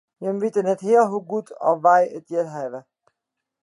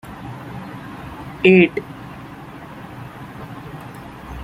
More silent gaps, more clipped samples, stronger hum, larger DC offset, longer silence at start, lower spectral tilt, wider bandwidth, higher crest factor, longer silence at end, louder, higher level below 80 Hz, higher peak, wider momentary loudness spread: neither; neither; neither; neither; first, 0.2 s vs 0.05 s; about the same, -7 dB/octave vs -7.5 dB/octave; second, 11 kHz vs 15 kHz; about the same, 18 dB vs 20 dB; first, 0.8 s vs 0 s; second, -21 LUFS vs -15 LUFS; second, -80 dBFS vs -48 dBFS; about the same, -4 dBFS vs -2 dBFS; second, 13 LU vs 23 LU